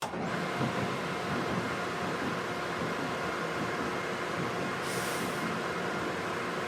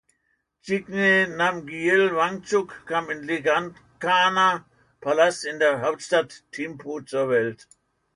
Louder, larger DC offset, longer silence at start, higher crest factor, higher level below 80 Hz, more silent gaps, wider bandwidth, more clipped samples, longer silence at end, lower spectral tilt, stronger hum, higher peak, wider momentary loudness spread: second, -33 LUFS vs -23 LUFS; neither; second, 0 s vs 0.65 s; about the same, 16 dB vs 18 dB; about the same, -64 dBFS vs -66 dBFS; neither; first, 19.5 kHz vs 11 kHz; neither; second, 0 s vs 0.6 s; about the same, -4.5 dB/octave vs -4 dB/octave; neither; second, -18 dBFS vs -6 dBFS; second, 2 LU vs 13 LU